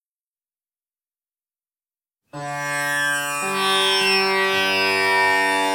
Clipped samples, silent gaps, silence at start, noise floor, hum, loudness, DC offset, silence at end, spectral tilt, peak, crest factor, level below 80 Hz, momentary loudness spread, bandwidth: under 0.1%; none; 2.35 s; under -90 dBFS; none; -18 LUFS; under 0.1%; 0 s; -1.5 dB/octave; -6 dBFS; 16 dB; -72 dBFS; 8 LU; 18 kHz